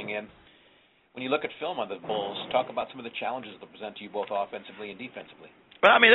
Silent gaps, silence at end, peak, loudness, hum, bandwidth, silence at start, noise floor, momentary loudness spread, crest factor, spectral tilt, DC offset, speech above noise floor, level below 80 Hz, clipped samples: none; 0 s; -2 dBFS; -29 LUFS; none; 4.3 kHz; 0 s; -62 dBFS; 15 LU; 26 dB; 0 dB/octave; under 0.1%; 34 dB; -72 dBFS; under 0.1%